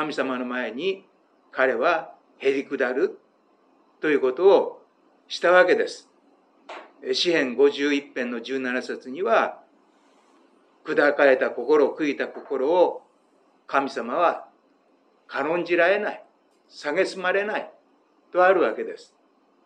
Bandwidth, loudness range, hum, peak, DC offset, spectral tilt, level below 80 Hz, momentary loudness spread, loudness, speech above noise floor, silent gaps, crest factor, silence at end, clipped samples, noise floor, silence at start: 9.4 kHz; 4 LU; none; -4 dBFS; under 0.1%; -4 dB/octave; under -90 dBFS; 16 LU; -23 LUFS; 40 dB; none; 22 dB; 0.6 s; under 0.1%; -62 dBFS; 0 s